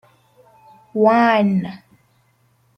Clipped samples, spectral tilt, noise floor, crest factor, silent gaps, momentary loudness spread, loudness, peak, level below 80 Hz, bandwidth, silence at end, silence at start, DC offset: under 0.1%; -8 dB/octave; -60 dBFS; 18 dB; none; 15 LU; -16 LUFS; -2 dBFS; -66 dBFS; 6.2 kHz; 1 s; 0.95 s; under 0.1%